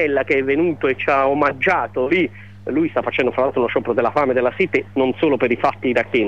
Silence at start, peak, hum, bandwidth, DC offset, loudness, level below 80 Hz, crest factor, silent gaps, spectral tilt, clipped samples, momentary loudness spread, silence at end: 0 s; -6 dBFS; 50 Hz at -40 dBFS; 7.6 kHz; 0.5%; -18 LUFS; -54 dBFS; 12 dB; none; -7 dB/octave; under 0.1%; 3 LU; 0 s